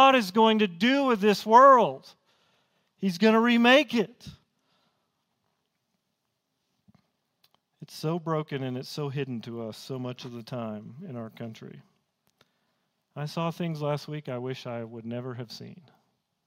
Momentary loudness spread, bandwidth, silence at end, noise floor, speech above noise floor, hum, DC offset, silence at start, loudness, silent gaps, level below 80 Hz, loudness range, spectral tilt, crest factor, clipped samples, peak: 21 LU; 16 kHz; 0.7 s; -80 dBFS; 54 dB; none; under 0.1%; 0 s; -25 LUFS; none; -74 dBFS; 17 LU; -5.5 dB/octave; 22 dB; under 0.1%; -6 dBFS